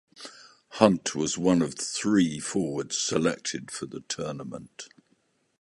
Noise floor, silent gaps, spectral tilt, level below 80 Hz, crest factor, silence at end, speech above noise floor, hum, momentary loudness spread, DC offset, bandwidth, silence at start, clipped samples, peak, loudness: -70 dBFS; none; -4 dB/octave; -62 dBFS; 26 dB; 0.75 s; 43 dB; none; 21 LU; under 0.1%; 11.5 kHz; 0.2 s; under 0.1%; -2 dBFS; -27 LUFS